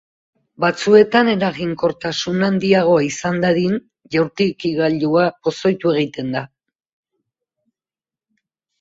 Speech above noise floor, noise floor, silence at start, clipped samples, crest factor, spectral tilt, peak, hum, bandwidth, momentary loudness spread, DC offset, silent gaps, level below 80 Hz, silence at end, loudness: over 73 dB; under -90 dBFS; 0.6 s; under 0.1%; 18 dB; -5.5 dB/octave; 0 dBFS; none; 7.8 kHz; 10 LU; under 0.1%; none; -56 dBFS; 2.35 s; -17 LUFS